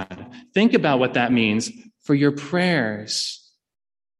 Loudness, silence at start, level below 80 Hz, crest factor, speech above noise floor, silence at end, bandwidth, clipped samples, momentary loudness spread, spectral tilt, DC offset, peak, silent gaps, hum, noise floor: -21 LUFS; 0 s; -62 dBFS; 18 dB; 20 dB; 0.85 s; 12 kHz; under 0.1%; 16 LU; -5 dB/octave; under 0.1%; -4 dBFS; none; none; -40 dBFS